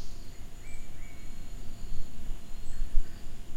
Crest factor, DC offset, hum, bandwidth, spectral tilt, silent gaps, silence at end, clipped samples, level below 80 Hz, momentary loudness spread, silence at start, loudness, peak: 18 dB; under 0.1%; none; 8 kHz; -5 dB/octave; none; 0 s; under 0.1%; -32 dBFS; 10 LU; 0 s; -45 LUFS; -8 dBFS